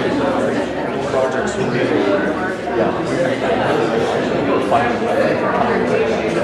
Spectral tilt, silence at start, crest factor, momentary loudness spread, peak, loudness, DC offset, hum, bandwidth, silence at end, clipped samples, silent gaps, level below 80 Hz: -6 dB/octave; 0 s; 14 dB; 3 LU; -2 dBFS; -17 LUFS; under 0.1%; none; 12.5 kHz; 0 s; under 0.1%; none; -44 dBFS